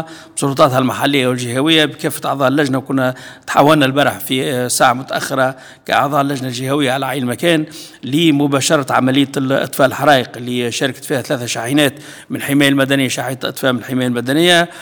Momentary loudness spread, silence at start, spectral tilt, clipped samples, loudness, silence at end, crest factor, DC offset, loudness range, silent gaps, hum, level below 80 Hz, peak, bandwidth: 8 LU; 0 s; -4.5 dB/octave; 0.2%; -15 LUFS; 0 s; 16 dB; under 0.1%; 2 LU; none; none; -58 dBFS; 0 dBFS; over 20 kHz